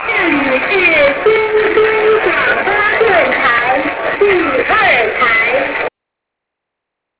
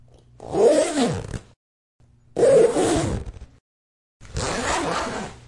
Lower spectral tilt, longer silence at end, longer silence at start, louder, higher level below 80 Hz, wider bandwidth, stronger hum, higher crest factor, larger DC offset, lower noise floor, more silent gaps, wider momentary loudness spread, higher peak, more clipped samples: first, -7 dB/octave vs -4.5 dB/octave; first, 1.3 s vs 0.15 s; second, 0 s vs 0.4 s; first, -11 LUFS vs -21 LUFS; about the same, -44 dBFS vs -42 dBFS; second, 4 kHz vs 11.5 kHz; neither; second, 12 dB vs 18 dB; neither; first, -78 dBFS vs -43 dBFS; second, none vs 1.56-1.99 s, 3.60-4.20 s; second, 5 LU vs 18 LU; first, 0 dBFS vs -4 dBFS; neither